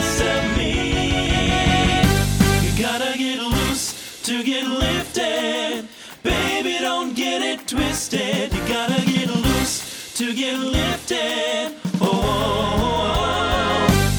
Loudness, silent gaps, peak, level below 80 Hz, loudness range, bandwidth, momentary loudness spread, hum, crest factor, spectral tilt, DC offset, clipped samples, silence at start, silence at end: -20 LUFS; none; -2 dBFS; -32 dBFS; 3 LU; over 20 kHz; 7 LU; none; 18 dB; -4 dB/octave; under 0.1%; under 0.1%; 0 s; 0 s